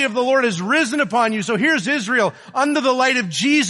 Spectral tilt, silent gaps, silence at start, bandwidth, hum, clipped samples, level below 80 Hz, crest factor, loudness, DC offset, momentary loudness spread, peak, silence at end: -3.5 dB/octave; none; 0 s; 11.5 kHz; none; under 0.1%; -68 dBFS; 14 dB; -18 LUFS; under 0.1%; 2 LU; -4 dBFS; 0 s